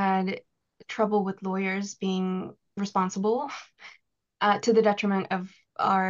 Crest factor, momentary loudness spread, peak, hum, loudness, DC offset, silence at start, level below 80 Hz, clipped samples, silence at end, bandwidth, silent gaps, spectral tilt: 16 dB; 16 LU; -10 dBFS; none; -27 LUFS; under 0.1%; 0 s; -74 dBFS; under 0.1%; 0 s; 7.4 kHz; none; -5.5 dB/octave